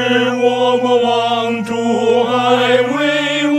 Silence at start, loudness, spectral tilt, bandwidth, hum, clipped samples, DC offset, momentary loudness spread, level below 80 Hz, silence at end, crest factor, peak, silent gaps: 0 s; -14 LUFS; -4.5 dB/octave; 12 kHz; none; under 0.1%; under 0.1%; 4 LU; -62 dBFS; 0 s; 14 dB; 0 dBFS; none